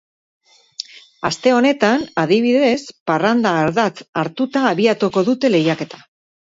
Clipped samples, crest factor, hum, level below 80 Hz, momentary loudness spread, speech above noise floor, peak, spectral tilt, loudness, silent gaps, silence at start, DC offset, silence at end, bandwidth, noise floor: under 0.1%; 16 dB; none; -60 dBFS; 14 LU; 19 dB; 0 dBFS; -5.5 dB/octave; -17 LUFS; 3.01-3.06 s, 4.09-4.13 s; 1.2 s; under 0.1%; 0.5 s; 8 kHz; -36 dBFS